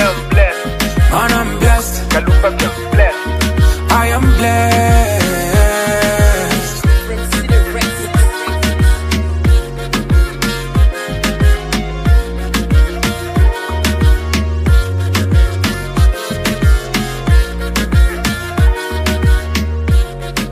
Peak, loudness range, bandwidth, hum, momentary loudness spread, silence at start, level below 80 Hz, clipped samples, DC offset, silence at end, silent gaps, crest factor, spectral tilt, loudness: 0 dBFS; 3 LU; 15.5 kHz; none; 6 LU; 0 s; -14 dBFS; under 0.1%; under 0.1%; 0 s; none; 12 dB; -5 dB/octave; -14 LUFS